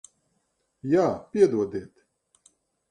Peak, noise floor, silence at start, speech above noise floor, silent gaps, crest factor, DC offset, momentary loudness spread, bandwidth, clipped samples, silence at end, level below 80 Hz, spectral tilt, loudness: -8 dBFS; -74 dBFS; 0.85 s; 51 dB; none; 20 dB; under 0.1%; 14 LU; 9.8 kHz; under 0.1%; 1.05 s; -64 dBFS; -7 dB/octave; -24 LUFS